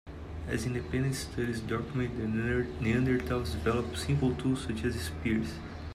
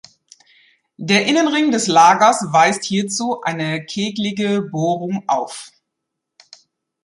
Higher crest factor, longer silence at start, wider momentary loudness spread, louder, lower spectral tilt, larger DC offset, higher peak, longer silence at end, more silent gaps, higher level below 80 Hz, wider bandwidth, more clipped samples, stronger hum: about the same, 16 dB vs 18 dB; second, 0.05 s vs 1 s; second, 5 LU vs 11 LU; second, -32 LUFS vs -16 LUFS; first, -6 dB/octave vs -4 dB/octave; neither; second, -16 dBFS vs -2 dBFS; second, 0 s vs 1.35 s; neither; first, -46 dBFS vs -64 dBFS; first, 15 kHz vs 11.5 kHz; neither; neither